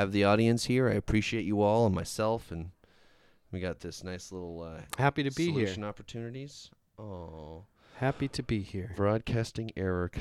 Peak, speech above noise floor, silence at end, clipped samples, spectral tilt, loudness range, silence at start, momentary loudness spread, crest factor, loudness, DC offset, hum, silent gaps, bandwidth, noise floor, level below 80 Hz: -12 dBFS; 31 dB; 0 s; under 0.1%; -6 dB/octave; 7 LU; 0 s; 18 LU; 20 dB; -31 LUFS; under 0.1%; none; none; 15 kHz; -62 dBFS; -52 dBFS